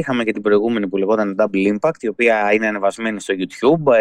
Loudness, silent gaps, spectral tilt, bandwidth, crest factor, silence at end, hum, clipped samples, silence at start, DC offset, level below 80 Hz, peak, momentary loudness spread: -18 LUFS; none; -6 dB/octave; 11.5 kHz; 14 dB; 0 s; none; under 0.1%; 0 s; under 0.1%; -60 dBFS; -2 dBFS; 6 LU